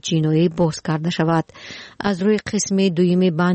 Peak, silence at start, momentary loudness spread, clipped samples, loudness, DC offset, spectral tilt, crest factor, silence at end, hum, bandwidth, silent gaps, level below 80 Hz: -8 dBFS; 0.05 s; 9 LU; under 0.1%; -19 LUFS; under 0.1%; -6 dB/octave; 12 dB; 0 s; none; 8.8 kHz; none; -52 dBFS